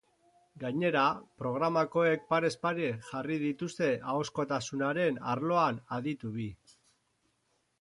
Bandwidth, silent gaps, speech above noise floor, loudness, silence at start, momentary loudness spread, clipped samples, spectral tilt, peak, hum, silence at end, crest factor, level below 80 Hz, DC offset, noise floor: 11.5 kHz; none; 45 dB; -32 LUFS; 0.55 s; 9 LU; under 0.1%; -6 dB/octave; -14 dBFS; none; 1.25 s; 18 dB; -70 dBFS; under 0.1%; -76 dBFS